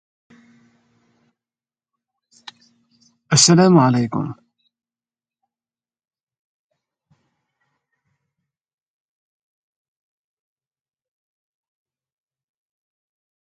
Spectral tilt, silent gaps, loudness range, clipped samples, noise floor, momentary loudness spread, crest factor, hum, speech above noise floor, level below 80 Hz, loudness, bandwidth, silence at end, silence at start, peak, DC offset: -4.5 dB/octave; none; 9 LU; under 0.1%; under -90 dBFS; 15 LU; 24 dB; none; over 76 dB; -64 dBFS; -14 LUFS; 9.6 kHz; 9.15 s; 3.3 s; 0 dBFS; under 0.1%